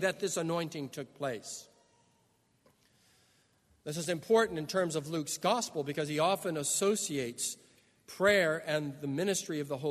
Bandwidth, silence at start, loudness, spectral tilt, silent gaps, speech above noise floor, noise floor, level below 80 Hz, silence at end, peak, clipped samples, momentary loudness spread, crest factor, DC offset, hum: 13.5 kHz; 0 s; -32 LUFS; -3.5 dB/octave; none; 39 dB; -71 dBFS; -72 dBFS; 0 s; -12 dBFS; under 0.1%; 13 LU; 20 dB; under 0.1%; none